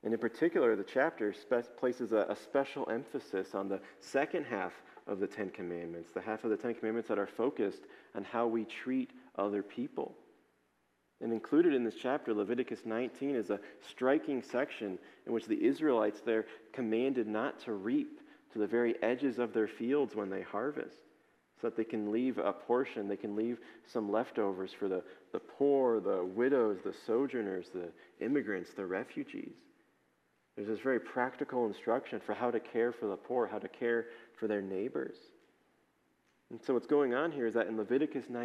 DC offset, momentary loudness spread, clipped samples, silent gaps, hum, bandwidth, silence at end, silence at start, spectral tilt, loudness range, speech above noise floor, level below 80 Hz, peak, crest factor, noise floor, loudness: under 0.1%; 12 LU; under 0.1%; none; none; 11.5 kHz; 0 s; 0.05 s; -6.5 dB/octave; 5 LU; 42 dB; -88 dBFS; -16 dBFS; 18 dB; -76 dBFS; -35 LUFS